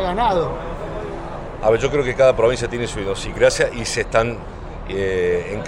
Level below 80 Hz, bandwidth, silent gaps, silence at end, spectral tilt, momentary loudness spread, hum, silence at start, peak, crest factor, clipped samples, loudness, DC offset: -34 dBFS; 12 kHz; none; 0 s; -4.5 dB/octave; 14 LU; none; 0 s; 0 dBFS; 18 dB; under 0.1%; -20 LUFS; under 0.1%